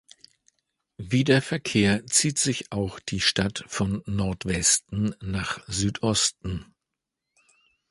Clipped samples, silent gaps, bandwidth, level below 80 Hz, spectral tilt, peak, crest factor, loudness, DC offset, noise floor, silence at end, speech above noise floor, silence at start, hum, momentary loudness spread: under 0.1%; none; 11.5 kHz; -46 dBFS; -3.5 dB/octave; -6 dBFS; 20 dB; -24 LUFS; under 0.1%; -85 dBFS; 1.3 s; 60 dB; 1 s; none; 10 LU